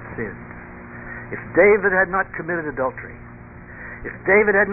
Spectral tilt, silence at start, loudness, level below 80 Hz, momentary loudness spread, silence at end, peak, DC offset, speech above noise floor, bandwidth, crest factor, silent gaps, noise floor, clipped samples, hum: -12.5 dB/octave; 0 s; -19 LUFS; -46 dBFS; 23 LU; 0 s; -4 dBFS; under 0.1%; 20 dB; 2.9 kHz; 18 dB; none; -39 dBFS; under 0.1%; 60 Hz at -55 dBFS